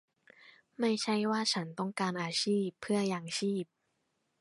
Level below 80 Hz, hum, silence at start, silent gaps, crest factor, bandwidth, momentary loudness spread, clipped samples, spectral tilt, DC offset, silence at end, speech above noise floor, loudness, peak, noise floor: -78 dBFS; none; 0.45 s; none; 16 dB; 11.5 kHz; 5 LU; under 0.1%; -4.5 dB/octave; under 0.1%; 0.75 s; 47 dB; -33 LUFS; -18 dBFS; -80 dBFS